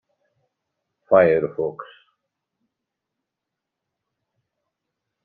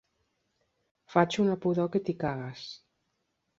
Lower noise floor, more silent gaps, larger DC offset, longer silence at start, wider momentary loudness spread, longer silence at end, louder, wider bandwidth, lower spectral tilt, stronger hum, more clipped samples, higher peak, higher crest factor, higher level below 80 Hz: first, -84 dBFS vs -79 dBFS; neither; neither; about the same, 1.1 s vs 1.1 s; second, 14 LU vs 17 LU; first, 3.4 s vs 0.85 s; first, -19 LUFS vs -29 LUFS; second, 4.4 kHz vs 7.8 kHz; about the same, -6 dB/octave vs -6.5 dB/octave; neither; neither; first, -2 dBFS vs -8 dBFS; about the same, 24 dB vs 24 dB; about the same, -64 dBFS vs -66 dBFS